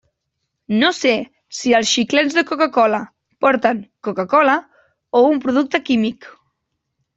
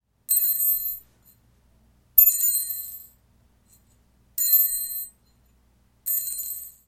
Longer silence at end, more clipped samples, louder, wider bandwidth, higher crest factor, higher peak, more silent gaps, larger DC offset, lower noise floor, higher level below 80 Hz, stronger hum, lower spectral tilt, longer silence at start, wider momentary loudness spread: first, 0.85 s vs 0.15 s; neither; first, -17 LUFS vs -20 LUFS; second, 8 kHz vs 16.5 kHz; second, 16 dB vs 24 dB; about the same, -2 dBFS vs -2 dBFS; neither; neither; first, -75 dBFS vs -62 dBFS; about the same, -62 dBFS vs -58 dBFS; second, none vs 60 Hz at -65 dBFS; first, -3.5 dB/octave vs 2 dB/octave; first, 0.7 s vs 0.3 s; second, 9 LU vs 19 LU